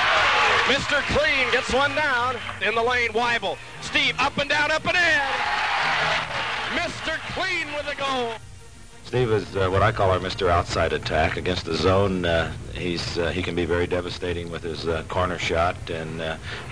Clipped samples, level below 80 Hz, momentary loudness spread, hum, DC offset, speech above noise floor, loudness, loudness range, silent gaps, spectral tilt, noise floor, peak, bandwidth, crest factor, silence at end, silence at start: under 0.1%; -42 dBFS; 10 LU; none; 0.5%; 21 dB; -23 LUFS; 5 LU; none; -4 dB/octave; -45 dBFS; -10 dBFS; 10.5 kHz; 14 dB; 0 s; 0 s